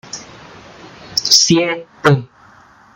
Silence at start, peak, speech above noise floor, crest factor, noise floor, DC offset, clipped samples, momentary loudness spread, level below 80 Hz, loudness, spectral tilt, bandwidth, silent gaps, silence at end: 0.15 s; 0 dBFS; 32 dB; 18 dB; -46 dBFS; under 0.1%; under 0.1%; 17 LU; -56 dBFS; -13 LUFS; -3 dB/octave; 16.5 kHz; none; 0.7 s